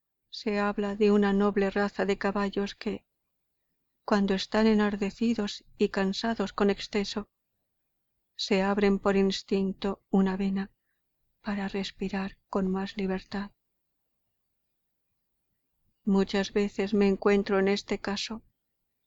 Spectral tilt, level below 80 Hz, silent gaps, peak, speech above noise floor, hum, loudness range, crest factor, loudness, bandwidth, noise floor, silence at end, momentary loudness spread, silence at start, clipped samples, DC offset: -6 dB/octave; -54 dBFS; none; -12 dBFS; 53 dB; none; 7 LU; 18 dB; -28 LUFS; 7.8 kHz; -80 dBFS; 0.65 s; 12 LU; 0.35 s; under 0.1%; under 0.1%